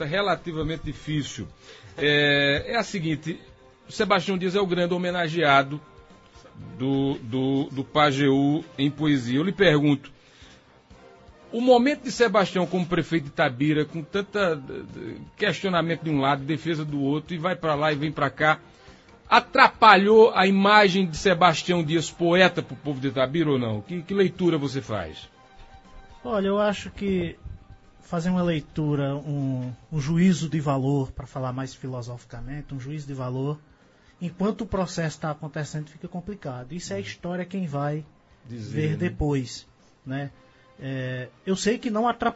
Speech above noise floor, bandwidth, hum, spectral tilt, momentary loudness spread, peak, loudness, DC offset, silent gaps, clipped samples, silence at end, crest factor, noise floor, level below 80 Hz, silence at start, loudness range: 32 dB; 8 kHz; none; -5.5 dB/octave; 17 LU; 0 dBFS; -24 LUFS; under 0.1%; none; under 0.1%; 0 s; 24 dB; -56 dBFS; -50 dBFS; 0 s; 12 LU